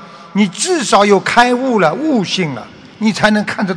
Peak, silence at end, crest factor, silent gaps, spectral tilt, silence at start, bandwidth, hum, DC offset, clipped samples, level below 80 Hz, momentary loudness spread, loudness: 0 dBFS; 0 s; 14 dB; none; -4 dB/octave; 0 s; 11 kHz; none; under 0.1%; 0.4%; -48 dBFS; 8 LU; -13 LUFS